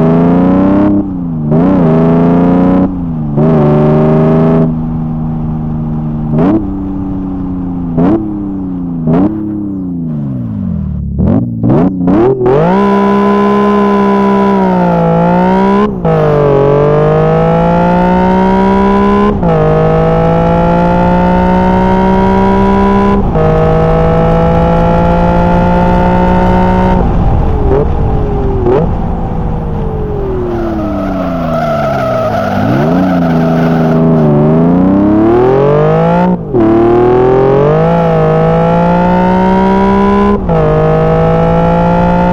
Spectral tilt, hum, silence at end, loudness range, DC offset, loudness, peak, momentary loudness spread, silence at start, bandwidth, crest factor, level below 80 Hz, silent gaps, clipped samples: -9.5 dB/octave; none; 0 s; 6 LU; 0.1%; -9 LUFS; 0 dBFS; 8 LU; 0 s; 6.8 kHz; 8 dB; -20 dBFS; none; under 0.1%